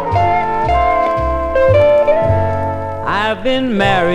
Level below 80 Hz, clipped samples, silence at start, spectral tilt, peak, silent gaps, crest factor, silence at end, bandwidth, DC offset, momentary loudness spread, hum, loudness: -28 dBFS; under 0.1%; 0 s; -7 dB/octave; 0 dBFS; none; 14 dB; 0 s; 10.5 kHz; under 0.1%; 7 LU; none; -14 LUFS